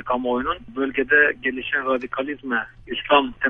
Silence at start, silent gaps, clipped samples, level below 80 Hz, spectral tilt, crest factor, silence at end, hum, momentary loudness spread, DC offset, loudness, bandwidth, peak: 0 s; none; under 0.1%; -50 dBFS; -6.5 dB/octave; 20 dB; 0 s; none; 11 LU; under 0.1%; -22 LUFS; 5.4 kHz; -2 dBFS